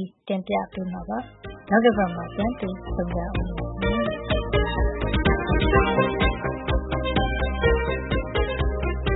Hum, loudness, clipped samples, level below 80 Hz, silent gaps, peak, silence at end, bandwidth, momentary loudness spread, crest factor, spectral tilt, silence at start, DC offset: none; -24 LUFS; under 0.1%; -30 dBFS; none; -6 dBFS; 0 s; 4.1 kHz; 10 LU; 18 dB; -11 dB/octave; 0 s; under 0.1%